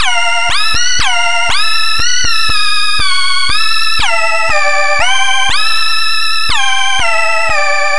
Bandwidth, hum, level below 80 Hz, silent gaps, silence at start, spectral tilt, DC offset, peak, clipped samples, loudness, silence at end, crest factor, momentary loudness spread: 12 kHz; none; -34 dBFS; none; 0 s; 0 dB/octave; 30%; 0 dBFS; under 0.1%; -11 LUFS; 0 s; 12 dB; 1 LU